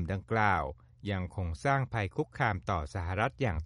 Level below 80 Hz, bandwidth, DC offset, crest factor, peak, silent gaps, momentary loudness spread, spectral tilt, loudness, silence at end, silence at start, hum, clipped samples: -46 dBFS; 11.5 kHz; under 0.1%; 20 dB; -12 dBFS; none; 8 LU; -7 dB/octave; -32 LUFS; 0 s; 0 s; none; under 0.1%